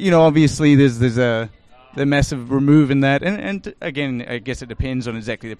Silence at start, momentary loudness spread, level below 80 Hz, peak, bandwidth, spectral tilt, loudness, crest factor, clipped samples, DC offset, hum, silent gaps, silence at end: 0 s; 13 LU; -38 dBFS; -2 dBFS; 11 kHz; -6.5 dB/octave; -18 LUFS; 14 dB; under 0.1%; under 0.1%; none; none; 0.05 s